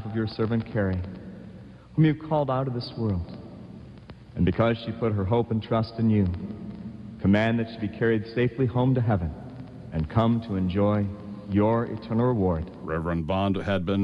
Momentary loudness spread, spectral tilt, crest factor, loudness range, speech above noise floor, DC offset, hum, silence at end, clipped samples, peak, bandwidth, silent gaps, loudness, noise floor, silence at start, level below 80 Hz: 17 LU; -9.5 dB/octave; 16 dB; 3 LU; 20 dB; under 0.1%; none; 0 s; under 0.1%; -10 dBFS; 5.8 kHz; none; -26 LUFS; -45 dBFS; 0 s; -46 dBFS